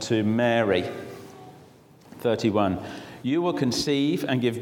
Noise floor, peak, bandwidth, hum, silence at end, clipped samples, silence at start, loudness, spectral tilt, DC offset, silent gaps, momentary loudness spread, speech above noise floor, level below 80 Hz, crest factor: -52 dBFS; -8 dBFS; 18 kHz; none; 0 s; under 0.1%; 0 s; -25 LUFS; -5.5 dB/octave; under 0.1%; none; 16 LU; 28 dB; -60 dBFS; 18 dB